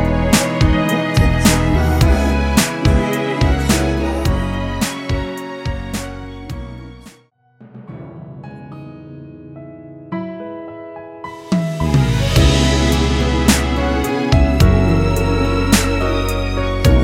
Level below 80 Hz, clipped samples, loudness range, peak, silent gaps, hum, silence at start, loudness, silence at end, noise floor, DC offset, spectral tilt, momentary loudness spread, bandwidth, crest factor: -22 dBFS; under 0.1%; 18 LU; 0 dBFS; none; none; 0 s; -16 LUFS; 0 s; -51 dBFS; under 0.1%; -5.5 dB/octave; 20 LU; 16.5 kHz; 16 dB